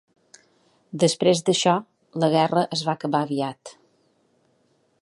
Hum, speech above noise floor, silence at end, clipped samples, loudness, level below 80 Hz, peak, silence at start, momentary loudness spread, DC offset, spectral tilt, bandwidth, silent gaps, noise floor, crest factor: none; 44 dB; 1.35 s; under 0.1%; -22 LUFS; -72 dBFS; -6 dBFS; 0.95 s; 12 LU; under 0.1%; -4.5 dB/octave; 11.5 kHz; none; -65 dBFS; 20 dB